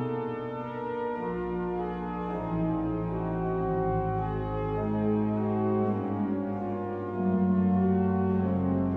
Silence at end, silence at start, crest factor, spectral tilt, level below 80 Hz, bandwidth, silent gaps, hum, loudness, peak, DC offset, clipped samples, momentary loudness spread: 0 s; 0 s; 12 dB; -11 dB/octave; -46 dBFS; 4 kHz; none; none; -29 LUFS; -16 dBFS; under 0.1%; under 0.1%; 8 LU